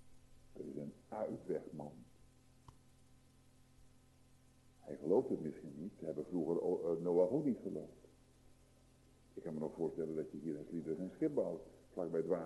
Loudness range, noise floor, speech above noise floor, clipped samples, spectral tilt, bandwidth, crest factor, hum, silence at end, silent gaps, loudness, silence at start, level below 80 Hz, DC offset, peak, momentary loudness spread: 11 LU; -68 dBFS; 28 dB; under 0.1%; -9 dB/octave; 12 kHz; 22 dB; none; 0 s; none; -41 LUFS; 0 s; -72 dBFS; under 0.1%; -22 dBFS; 16 LU